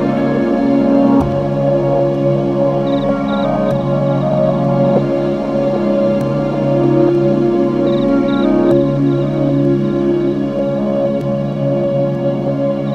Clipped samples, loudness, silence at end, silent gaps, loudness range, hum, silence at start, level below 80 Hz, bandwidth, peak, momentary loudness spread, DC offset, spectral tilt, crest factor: under 0.1%; -14 LUFS; 0 s; none; 2 LU; none; 0 s; -38 dBFS; 7.2 kHz; 0 dBFS; 5 LU; under 0.1%; -9.5 dB/octave; 12 dB